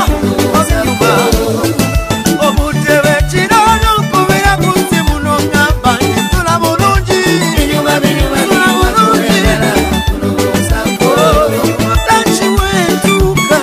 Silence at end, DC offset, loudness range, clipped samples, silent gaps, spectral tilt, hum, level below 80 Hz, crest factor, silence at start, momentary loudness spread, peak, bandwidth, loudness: 0 s; under 0.1%; 1 LU; under 0.1%; none; -4.5 dB/octave; none; -20 dBFS; 10 dB; 0 s; 4 LU; 0 dBFS; 15.5 kHz; -10 LUFS